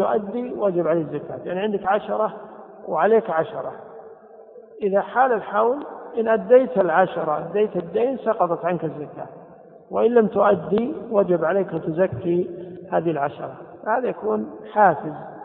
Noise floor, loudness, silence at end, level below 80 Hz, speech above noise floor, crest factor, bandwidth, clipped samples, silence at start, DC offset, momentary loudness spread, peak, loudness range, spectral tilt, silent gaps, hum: -45 dBFS; -22 LUFS; 0 s; -64 dBFS; 24 dB; 20 dB; 4.1 kHz; under 0.1%; 0 s; under 0.1%; 15 LU; -2 dBFS; 4 LU; -11 dB/octave; none; none